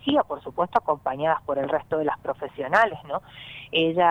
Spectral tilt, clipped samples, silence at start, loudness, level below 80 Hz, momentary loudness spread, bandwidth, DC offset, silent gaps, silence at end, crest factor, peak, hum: -6 dB/octave; under 0.1%; 0.05 s; -25 LUFS; -60 dBFS; 12 LU; 10 kHz; under 0.1%; none; 0 s; 18 dB; -6 dBFS; none